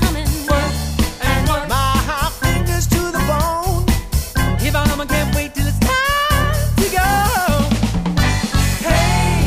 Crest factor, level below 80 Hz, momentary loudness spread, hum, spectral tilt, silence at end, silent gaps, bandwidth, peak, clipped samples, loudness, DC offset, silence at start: 14 dB; -22 dBFS; 4 LU; none; -4.5 dB/octave; 0 s; none; 15.5 kHz; -2 dBFS; under 0.1%; -17 LUFS; under 0.1%; 0 s